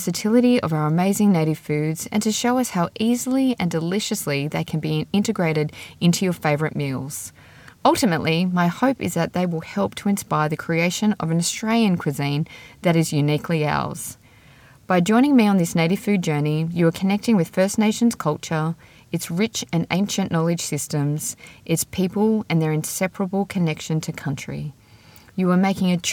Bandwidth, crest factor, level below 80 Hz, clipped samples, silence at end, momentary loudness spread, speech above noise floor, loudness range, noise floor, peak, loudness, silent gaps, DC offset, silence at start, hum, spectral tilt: 18 kHz; 18 dB; -58 dBFS; under 0.1%; 0 s; 8 LU; 29 dB; 3 LU; -49 dBFS; -2 dBFS; -21 LUFS; none; under 0.1%; 0 s; none; -5.5 dB/octave